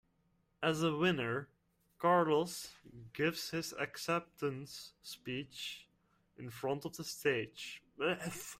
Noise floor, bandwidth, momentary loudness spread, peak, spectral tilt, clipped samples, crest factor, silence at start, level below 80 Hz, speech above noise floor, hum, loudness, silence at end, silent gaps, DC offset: -76 dBFS; 16 kHz; 17 LU; -18 dBFS; -4.5 dB/octave; under 0.1%; 20 dB; 0.6 s; -72 dBFS; 39 dB; none; -37 LUFS; 0 s; none; under 0.1%